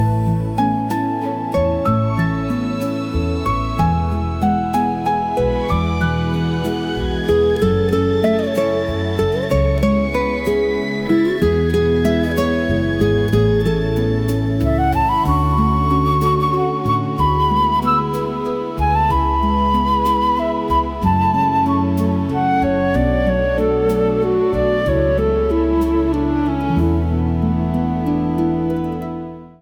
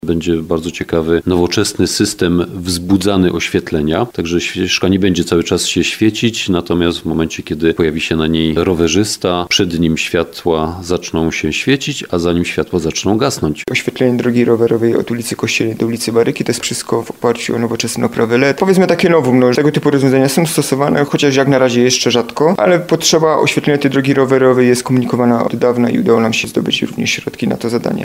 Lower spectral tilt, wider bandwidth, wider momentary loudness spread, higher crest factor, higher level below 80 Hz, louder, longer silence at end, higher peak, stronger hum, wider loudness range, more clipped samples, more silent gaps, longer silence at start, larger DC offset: first, -8 dB/octave vs -4.5 dB/octave; first, 19.5 kHz vs 16 kHz; about the same, 5 LU vs 6 LU; about the same, 12 dB vs 14 dB; first, -28 dBFS vs -40 dBFS; second, -18 LUFS vs -14 LUFS; about the same, 0.1 s vs 0 s; second, -4 dBFS vs 0 dBFS; neither; about the same, 2 LU vs 4 LU; neither; neither; about the same, 0 s vs 0.05 s; neither